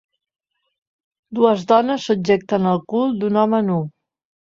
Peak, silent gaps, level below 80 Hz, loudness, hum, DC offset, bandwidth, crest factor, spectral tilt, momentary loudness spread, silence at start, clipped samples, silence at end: -2 dBFS; none; -62 dBFS; -18 LUFS; none; under 0.1%; 7.6 kHz; 18 dB; -7 dB/octave; 6 LU; 1.3 s; under 0.1%; 0.6 s